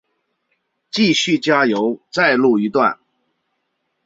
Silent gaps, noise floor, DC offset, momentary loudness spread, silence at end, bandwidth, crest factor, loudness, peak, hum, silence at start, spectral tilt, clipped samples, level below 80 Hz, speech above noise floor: none; -72 dBFS; under 0.1%; 7 LU; 1.1 s; 7.8 kHz; 18 dB; -16 LUFS; -2 dBFS; none; 0.95 s; -4.5 dB/octave; under 0.1%; -62 dBFS; 56 dB